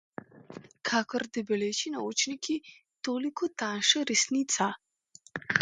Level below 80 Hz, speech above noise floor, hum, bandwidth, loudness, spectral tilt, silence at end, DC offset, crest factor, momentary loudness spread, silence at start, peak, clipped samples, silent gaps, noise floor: -74 dBFS; 29 dB; none; 10.5 kHz; -29 LUFS; -2 dB/octave; 0 s; under 0.1%; 26 dB; 21 LU; 0.35 s; -4 dBFS; under 0.1%; none; -59 dBFS